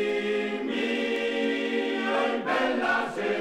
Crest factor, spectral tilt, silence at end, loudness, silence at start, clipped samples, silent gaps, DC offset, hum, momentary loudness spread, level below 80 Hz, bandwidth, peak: 14 dB; -4.5 dB/octave; 0 s; -27 LUFS; 0 s; under 0.1%; none; under 0.1%; none; 3 LU; -70 dBFS; 13 kHz; -14 dBFS